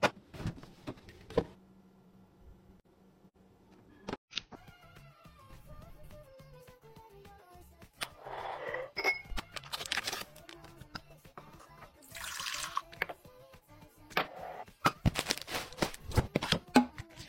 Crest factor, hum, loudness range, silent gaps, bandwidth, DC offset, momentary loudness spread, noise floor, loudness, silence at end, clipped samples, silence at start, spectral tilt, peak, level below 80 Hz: 32 dB; none; 13 LU; 4.18-4.28 s; 16.5 kHz; under 0.1%; 24 LU; -63 dBFS; -36 LUFS; 0 s; under 0.1%; 0 s; -4 dB/octave; -8 dBFS; -52 dBFS